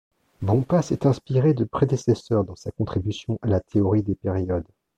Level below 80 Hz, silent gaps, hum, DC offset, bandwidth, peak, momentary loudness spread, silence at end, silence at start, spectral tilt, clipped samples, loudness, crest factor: -48 dBFS; none; none; under 0.1%; 9.2 kHz; -6 dBFS; 7 LU; 0.35 s; 0.4 s; -8 dB/octave; under 0.1%; -24 LUFS; 16 dB